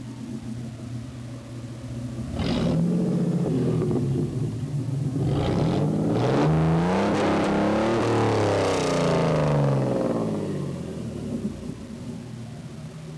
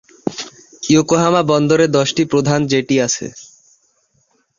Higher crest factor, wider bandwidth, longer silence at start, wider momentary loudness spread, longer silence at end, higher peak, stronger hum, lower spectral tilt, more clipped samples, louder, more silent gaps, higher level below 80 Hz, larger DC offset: second, 10 dB vs 16 dB; first, 11 kHz vs 7.6 kHz; second, 0 s vs 0.25 s; about the same, 15 LU vs 15 LU; second, 0 s vs 1.15 s; second, -14 dBFS vs -2 dBFS; neither; first, -7 dB/octave vs -5 dB/octave; neither; second, -24 LUFS vs -15 LUFS; neither; first, -44 dBFS vs -52 dBFS; neither